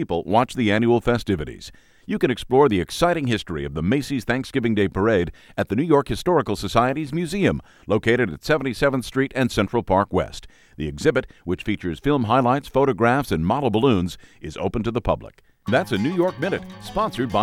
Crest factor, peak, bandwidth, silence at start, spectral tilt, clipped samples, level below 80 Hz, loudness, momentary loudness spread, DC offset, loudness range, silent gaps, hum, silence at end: 20 dB; -2 dBFS; 16 kHz; 0 s; -6.5 dB/octave; under 0.1%; -42 dBFS; -22 LUFS; 10 LU; under 0.1%; 2 LU; none; none; 0 s